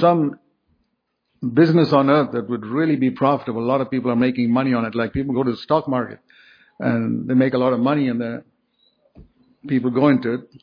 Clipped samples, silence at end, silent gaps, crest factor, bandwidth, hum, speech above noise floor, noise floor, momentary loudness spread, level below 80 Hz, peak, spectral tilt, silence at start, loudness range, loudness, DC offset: under 0.1%; 0.2 s; none; 18 dB; 5.2 kHz; none; 54 dB; -73 dBFS; 10 LU; -54 dBFS; -2 dBFS; -9.5 dB/octave; 0 s; 3 LU; -20 LUFS; under 0.1%